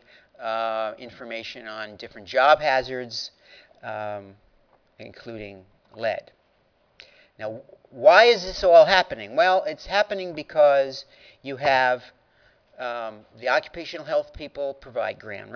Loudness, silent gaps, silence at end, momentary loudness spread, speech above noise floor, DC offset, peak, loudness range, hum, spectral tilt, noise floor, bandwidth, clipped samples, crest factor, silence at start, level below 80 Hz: -22 LUFS; none; 0 s; 21 LU; 42 dB; under 0.1%; 0 dBFS; 17 LU; none; -3.5 dB/octave; -65 dBFS; 5.4 kHz; under 0.1%; 24 dB; 0.4 s; -56 dBFS